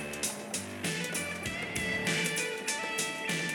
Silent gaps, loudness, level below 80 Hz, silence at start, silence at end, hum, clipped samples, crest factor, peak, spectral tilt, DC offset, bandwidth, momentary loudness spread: none; -32 LUFS; -62 dBFS; 0 s; 0 s; none; under 0.1%; 18 dB; -16 dBFS; -2.5 dB/octave; under 0.1%; 17 kHz; 5 LU